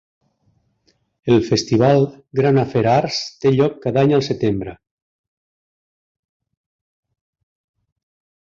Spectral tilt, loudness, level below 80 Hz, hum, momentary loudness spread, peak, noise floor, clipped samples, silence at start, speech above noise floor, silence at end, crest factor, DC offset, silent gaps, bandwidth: -6.5 dB/octave; -17 LUFS; -52 dBFS; none; 7 LU; -2 dBFS; -64 dBFS; under 0.1%; 1.25 s; 47 dB; 3.75 s; 18 dB; under 0.1%; none; 7.6 kHz